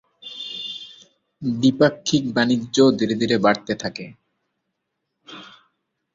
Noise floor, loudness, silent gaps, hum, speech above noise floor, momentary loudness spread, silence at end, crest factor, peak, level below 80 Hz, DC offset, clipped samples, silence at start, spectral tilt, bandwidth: -78 dBFS; -20 LUFS; none; none; 59 dB; 23 LU; 0.65 s; 20 dB; -2 dBFS; -60 dBFS; under 0.1%; under 0.1%; 0.25 s; -5 dB/octave; 7.8 kHz